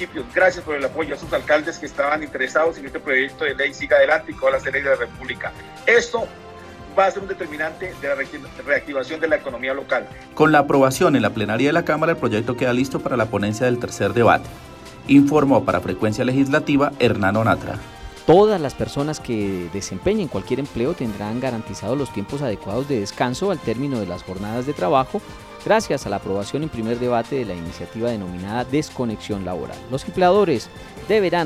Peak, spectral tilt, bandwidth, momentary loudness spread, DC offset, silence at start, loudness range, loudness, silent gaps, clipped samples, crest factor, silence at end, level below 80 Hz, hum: -2 dBFS; -5.5 dB/octave; 15 kHz; 13 LU; under 0.1%; 0 s; 6 LU; -21 LUFS; none; under 0.1%; 18 dB; 0 s; -46 dBFS; none